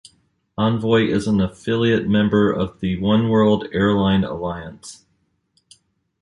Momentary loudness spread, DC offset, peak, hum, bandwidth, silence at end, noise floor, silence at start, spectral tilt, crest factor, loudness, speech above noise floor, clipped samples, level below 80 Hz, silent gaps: 13 LU; under 0.1%; -4 dBFS; none; 11 kHz; 1.3 s; -67 dBFS; 0.6 s; -7 dB/octave; 16 dB; -19 LUFS; 49 dB; under 0.1%; -44 dBFS; none